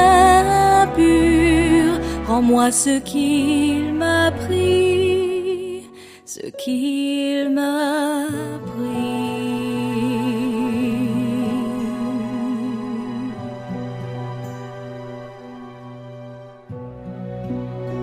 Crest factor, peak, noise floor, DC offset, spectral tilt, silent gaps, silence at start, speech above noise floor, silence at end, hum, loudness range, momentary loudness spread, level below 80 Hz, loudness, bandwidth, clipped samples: 16 dB; -2 dBFS; -41 dBFS; under 0.1%; -5 dB/octave; none; 0 s; 22 dB; 0 s; none; 16 LU; 20 LU; -38 dBFS; -19 LUFS; 15.5 kHz; under 0.1%